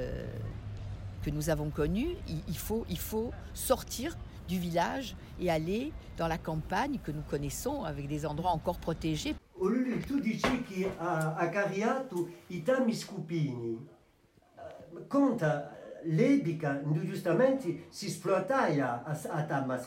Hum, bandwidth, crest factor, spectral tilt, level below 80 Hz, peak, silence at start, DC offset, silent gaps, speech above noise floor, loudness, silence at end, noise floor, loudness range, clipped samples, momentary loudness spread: none; 16 kHz; 18 dB; -6 dB/octave; -48 dBFS; -14 dBFS; 0 s; under 0.1%; none; 33 dB; -33 LUFS; 0 s; -65 dBFS; 4 LU; under 0.1%; 11 LU